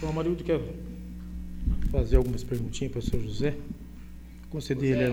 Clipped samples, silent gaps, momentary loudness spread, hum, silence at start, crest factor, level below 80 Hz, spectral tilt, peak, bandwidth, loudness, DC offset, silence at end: under 0.1%; none; 16 LU; none; 0 s; 20 dB; -32 dBFS; -7 dB/octave; -8 dBFS; 16.5 kHz; -30 LUFS; under 0.1%; 0 s